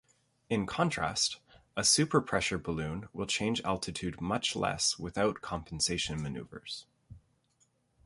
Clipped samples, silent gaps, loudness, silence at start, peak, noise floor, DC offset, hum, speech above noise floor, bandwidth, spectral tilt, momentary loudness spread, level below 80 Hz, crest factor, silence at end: under 0.1%; none; -32 LUFS; 0.5 s; -12 dBFS; -73 dBFS; under 0.1%; none; 40 dB; 11.5 kHz; -3 dB/octave; 14 LU; -56 dBFS; 22 dB; 0.85 s